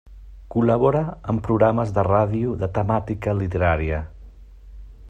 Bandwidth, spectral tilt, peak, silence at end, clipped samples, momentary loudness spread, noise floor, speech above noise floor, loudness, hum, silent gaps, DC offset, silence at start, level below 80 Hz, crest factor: 8 kHz; -9.5 dB/octave; -4 dBFS; 0 s; under 0.1%; 8 LU; -43 dBFS; 22 dB; -21 LUFS; none; none; under 0.1%; 0.05 s; -38 dBFS; 18 dB